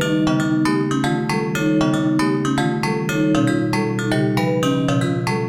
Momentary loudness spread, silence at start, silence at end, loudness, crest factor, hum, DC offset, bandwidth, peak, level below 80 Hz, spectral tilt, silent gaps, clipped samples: 3 LU; 0 s; 0 s; -19 LUFS; 14 dB; none; under 0.1%; 16 kHz; -6 dBFS; -48 dBFS; -6 dB/octave; none; under 0.1%